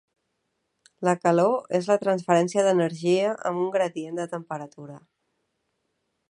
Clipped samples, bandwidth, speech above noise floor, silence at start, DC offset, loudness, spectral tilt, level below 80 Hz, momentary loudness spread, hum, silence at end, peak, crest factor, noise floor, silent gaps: under 0.1%; 11 kHz; 53 dB; 1 s; under 0.1%; -24 LUFS; -6 dB/octave; -76 dBFS; 14 LU; none; 1.3 s; -6 dBFS; 20 dB; -77 dBFS; none